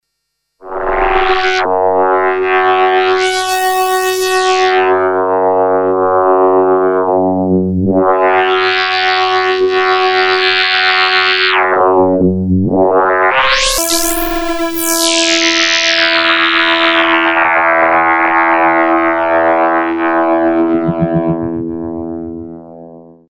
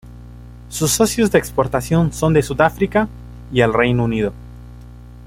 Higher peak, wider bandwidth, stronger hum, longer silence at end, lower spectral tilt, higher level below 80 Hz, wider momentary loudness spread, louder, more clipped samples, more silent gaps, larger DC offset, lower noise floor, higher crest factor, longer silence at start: about the same, 0 dBFS vs 0 dBFS; first, over 20 kHz vs 16.5 kHz; second, none vs 60 Hz at -30 dBFS; first, 0.3 s vs 0 s; second, -3.5 dB/octave vs -5 dB/octave; about the same, -36 dBFS vs -36 dBFS; second, 5 LU vs 10 LU; first, -11 LUFS vs -17 LUFS; neither; neither; neither; first, -70 dBFS vs -37 dBFS; second, 12 dB vs 18 dB; first, 0.65 s vs 0.05 s